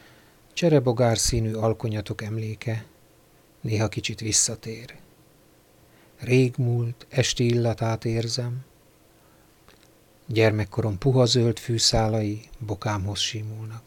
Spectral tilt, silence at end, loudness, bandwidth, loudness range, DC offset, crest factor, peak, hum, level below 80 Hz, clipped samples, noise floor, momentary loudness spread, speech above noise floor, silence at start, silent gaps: -4.5 dB/octave; 0.05 s; -24 LUFS; 17 kHz; 5 LU; under 0.1%; 20 dB; -6 dBFS; none; -46 dBFS; under 0.1%; -57 dBFS; 14 LU; 33 dB; 0.55 s; none